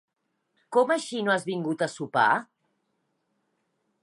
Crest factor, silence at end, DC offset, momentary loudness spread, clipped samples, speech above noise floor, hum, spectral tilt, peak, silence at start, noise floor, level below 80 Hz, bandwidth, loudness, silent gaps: 20 dB; 1.6 s; under 0.1%; 6 LU; under 0.1%; 50 dB; none; -4.5 dB/octave; -8 dBFS; 0.7 s; -76 dBFS; -80 dBFS; 11.5 kHz; -26 LUFS; none